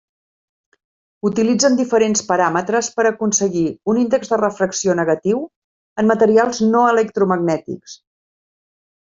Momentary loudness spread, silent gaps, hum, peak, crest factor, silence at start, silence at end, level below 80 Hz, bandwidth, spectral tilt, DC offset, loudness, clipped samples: 8 LU; 5.56-5.96 s; none; -2 dBFS; 16 dB; 1.25 s; 1.15 s; -60 dBFS; 7.8 kHz; -4.5 dB/octave; under 0.1%; -17 LUFS; under 0.1%